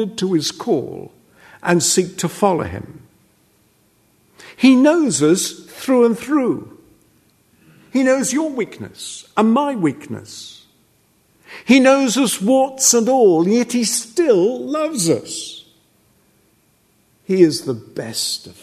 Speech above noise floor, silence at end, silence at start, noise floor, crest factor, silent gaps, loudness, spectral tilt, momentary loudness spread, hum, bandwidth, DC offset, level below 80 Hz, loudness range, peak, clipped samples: 42 dB; 0.1 s; 0 s; -59 dBFS; 18 dB; none; -16 LUFS; -4 dB/octave; 18 LU; none; 13.5 kHz; under 0.1%; -60 dBFS; 7 LU; 0 dBFS; under 0.1%